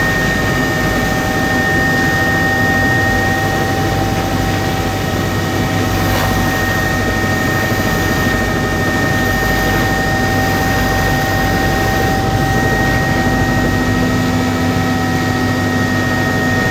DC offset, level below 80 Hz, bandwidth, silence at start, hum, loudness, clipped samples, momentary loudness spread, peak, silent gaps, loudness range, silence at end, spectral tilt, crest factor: under 0.1%; -26 dBFS; 18.5 kHz; 0 s; none; -14 LUFS; under 0.1%; 3 LU; -2 dBFS; none; 2 LU; 0 s; -5 dB/octave; 12 dB